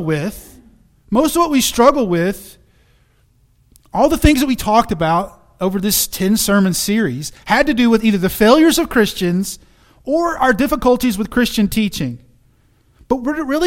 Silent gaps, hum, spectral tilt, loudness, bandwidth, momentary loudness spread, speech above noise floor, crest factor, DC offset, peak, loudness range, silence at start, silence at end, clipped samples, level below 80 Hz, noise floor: none; none; -4.5 dB/octave; -15 LUFS; 17 kHz; 12 LU; 40 dB; 16 dB; under 0.1%; 0 dBFS; 4 LU; 0 s; 0 s; under 0.1%; -34 dBFS; -55 dBFS